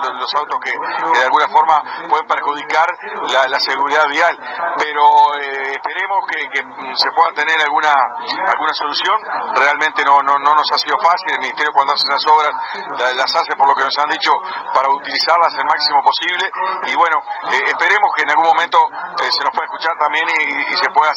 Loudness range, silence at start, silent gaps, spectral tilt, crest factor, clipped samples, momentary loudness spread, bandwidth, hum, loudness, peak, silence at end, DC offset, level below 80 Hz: 2 LU; 0 s; none; -1 dB/octave; 14 dB; under 0.1%; 7 LU; 9.6 kHz; none; -14 LUFS; 0 dBFS; 0 s; under 0.1%; -72 dBFS